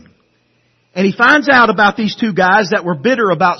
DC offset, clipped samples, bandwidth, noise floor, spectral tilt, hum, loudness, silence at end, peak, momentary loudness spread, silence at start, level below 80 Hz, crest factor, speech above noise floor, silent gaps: under 0.1%; under 0.1%; 6.4 kHz; -58 dBFS; -5.5 dB/octave; 60 Hz at -40 dBFS; -12 LUFS; 0 s; 0 dBFS; 9 LU; 0.95 s; -54 dBFS; 14 dB; 46 dB; none